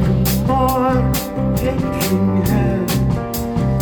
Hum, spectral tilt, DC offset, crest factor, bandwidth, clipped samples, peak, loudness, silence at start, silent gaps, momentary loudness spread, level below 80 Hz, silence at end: none; -6.5 dB/octave; under 0.1%; 12 dB; over 20 kHz; under 0.1%; -4 dBFS; -17 LUFS; 0 s; none; 4 LU; -28 dBFS; 0 s